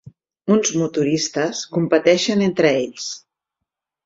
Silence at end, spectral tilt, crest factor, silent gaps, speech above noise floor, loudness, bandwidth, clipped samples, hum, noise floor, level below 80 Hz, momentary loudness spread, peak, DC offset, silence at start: 0.9 s; -4.5 dB/octave; 18 dB; none; 64 dB; -19 LUFS; 7.8 kHz; under 0.1%; none; -82 dBFS; -62 dBFS; 13 LU; -2 dBFS; under 0.1%; 0.05 s